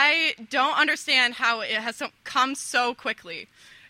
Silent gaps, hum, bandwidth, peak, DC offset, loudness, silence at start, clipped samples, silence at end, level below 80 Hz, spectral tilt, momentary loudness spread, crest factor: none; none; 16 kHz; -6 dBFS; under 0.1%; -23 LUFS; 0 s; under 0.1%; 0.45 s; -74 dBFS; -0.5 dB/octave; 13 LU; 20 dB